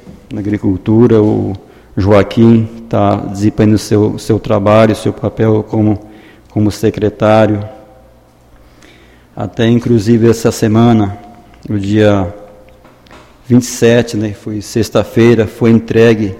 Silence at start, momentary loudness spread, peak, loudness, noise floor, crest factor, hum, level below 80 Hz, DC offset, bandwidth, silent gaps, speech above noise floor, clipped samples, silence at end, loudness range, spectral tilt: 0.05 s; 12 LU; 0 dBFS; -11 LUFS; -43 dBFS; 12 dB; none; -40 dBFS; under 0.1%; 15.5 kHz; none; 33 dB; 0.2%; 0 s; 4 LU; -7 dB/octave